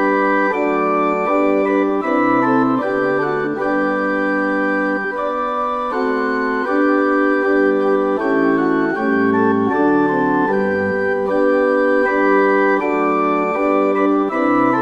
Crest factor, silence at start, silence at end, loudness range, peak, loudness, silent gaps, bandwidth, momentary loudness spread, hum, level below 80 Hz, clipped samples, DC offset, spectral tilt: 14 dB; 0 s; 0 s; 3 LU; -2 dBFS; -16 LUFS; none; 7.4 kHz; 4 LU; none; -50 dBFS; under 0.1%; under 0.1%; -7.5 dB/octave